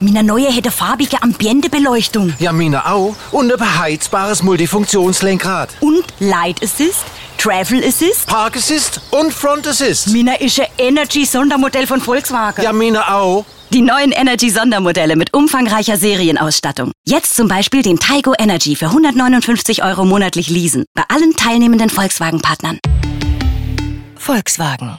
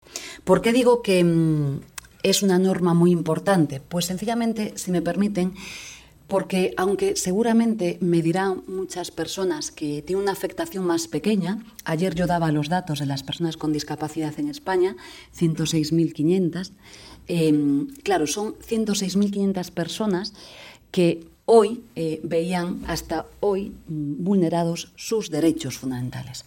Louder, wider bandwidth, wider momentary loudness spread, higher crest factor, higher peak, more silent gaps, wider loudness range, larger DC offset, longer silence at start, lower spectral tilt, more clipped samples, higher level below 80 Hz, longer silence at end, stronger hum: first, -13 LUFS vs -23 LUFS; about the same, 17 kHz vs 17.5 kHz; second, 5 LU vs 12 LU; second, 12 dB vs 18 dB; about the same, -2 dBFS vs -4 dBFS; first, 16.98-17.04 s, 20.87-20.95 s vs none; about the same, 2 LU vs 4 LU; first, 0.8% vs under 0.1%; about the same, 0 s vs 0.1 s; second, -4 dB/octave vs -5.5 dB/octave; neither; first, -30 dBFS vs -52 dBFS; about the same, 0 s vs 0.05 s; neither